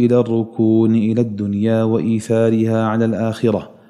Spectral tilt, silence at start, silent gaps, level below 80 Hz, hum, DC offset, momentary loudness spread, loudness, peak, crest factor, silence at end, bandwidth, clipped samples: -8.5 dB/octave; 0 s; none; -60 dBFS; none; under 0.1%; 5 LU; -17 LUFS; -2 dBFS; 14 dB; 0.25 s; 11 kHz; under 0.1%